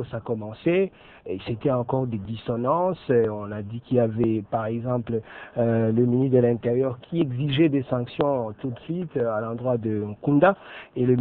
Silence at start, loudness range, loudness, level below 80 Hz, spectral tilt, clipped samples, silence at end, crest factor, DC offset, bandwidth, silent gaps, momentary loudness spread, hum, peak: 0 s; 2 LU; -25 LUFS; -56 dBFS; -11.5 dB/octave; under 0.1%; 0 s; 18 dB; under 0.1%; 4.3 kHz; none; 11 LU; none; -6 dBFS